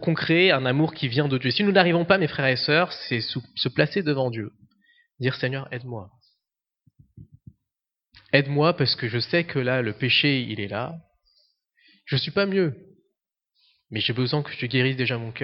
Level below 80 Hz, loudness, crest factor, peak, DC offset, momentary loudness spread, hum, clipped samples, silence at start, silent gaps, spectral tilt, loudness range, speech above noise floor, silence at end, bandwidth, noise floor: -64 dBFS; -23 LUFS; 24 dB; -2 dBFS; under 0.1%; 13 LU; none; under 0.1%; 0 s; none; -8.5 dB/octave; 9 LU; 63 dB; 0 s; 6 kHz; -86 dBFS